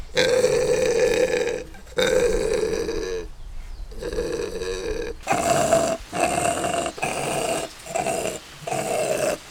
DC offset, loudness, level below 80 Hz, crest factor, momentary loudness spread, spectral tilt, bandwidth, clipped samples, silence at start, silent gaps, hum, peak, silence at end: under 0.1%; -23 LUFS; -40 dBFS; 20 dB; 11 LU; -3.5 dB/octave; over 20 kHz; under 0.1%; 0 s; none; none; -2 dBFS; 0 s